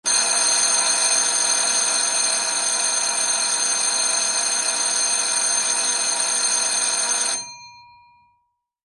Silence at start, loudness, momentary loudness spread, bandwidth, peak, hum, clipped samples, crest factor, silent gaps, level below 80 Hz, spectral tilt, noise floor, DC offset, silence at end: 0.05 s; -18 LUFS; 3 LU; 12 kHz; -6 dBFS; none; under 0.1%; 16 dB; none; -70 dBFS; 2.5 dB/octave; -70 dBFS; under 0.1%; 1.05 s